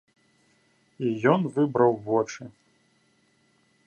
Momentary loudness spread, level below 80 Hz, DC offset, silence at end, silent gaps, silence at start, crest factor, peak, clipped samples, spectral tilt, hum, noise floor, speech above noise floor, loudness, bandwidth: 14 LU; -70 dBFS; under 0.1%; 1.35 s; none; 1 s; 24 dB; -4 dBFS; under 0.1%; -7 dB/octave; none; -66 dBFS; 42 dB; -25 LUFS; 8.8 kHz